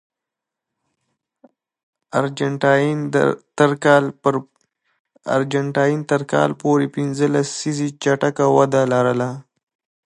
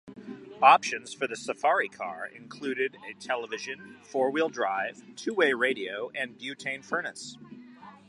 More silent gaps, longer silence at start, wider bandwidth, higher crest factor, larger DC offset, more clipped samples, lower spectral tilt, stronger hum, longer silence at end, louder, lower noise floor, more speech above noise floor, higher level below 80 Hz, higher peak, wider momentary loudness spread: first, 4.99-5.05 s vs none; first, 2.15 s vs 0.05 s; about the same, 11.5 kHz vs 11.5 kHz; second, 18 dB vs 26 dB; neither; neither; first, -6 dB/octave vs -3 dB/octave; neither; first, 0.65 s vs 0.15 s; first, -19 LUFS vs -28 LUFS; first, -85 dBFS vs -49 dBFS; first, 67 dB vs 21 dB; first, -66 dBFS vs -80 dBFS; first, 0 dBFS vs -4 dBFS; second, 7 LU vs 19 LU